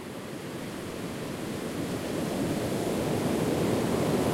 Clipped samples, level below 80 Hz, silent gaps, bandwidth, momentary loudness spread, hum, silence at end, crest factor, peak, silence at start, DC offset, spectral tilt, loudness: under 0.1%; -52 dBFS; none; 16 kHz; 10 LU; none; 0 s; 16 dB; -14 dBFS; 0 s; under 0.1%; -5.5 dB/octave; -31 LUFS